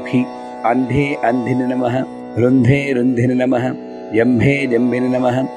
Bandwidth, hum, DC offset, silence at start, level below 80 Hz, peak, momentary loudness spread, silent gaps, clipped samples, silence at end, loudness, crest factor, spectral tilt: 9.8 kHz; none; under 0.1%; 0 s; -48 dBFS; 0 dBFS; 8 LU; none; under 0.1%; 0 s; -16 LUFS; 16 dB; -8 dB/octave